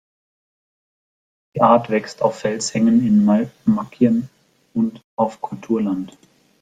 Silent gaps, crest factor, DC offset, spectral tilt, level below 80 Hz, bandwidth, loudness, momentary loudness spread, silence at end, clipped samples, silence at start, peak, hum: 5.04-5.17 s; 18 dB; under 0.1%; -6.5 dB/octave; -60 dBFS; 9.4 kHz; -19 LUFS; 13 LU; 0.55 s; under 0.1%; 1.55 s; -2 dBFS; none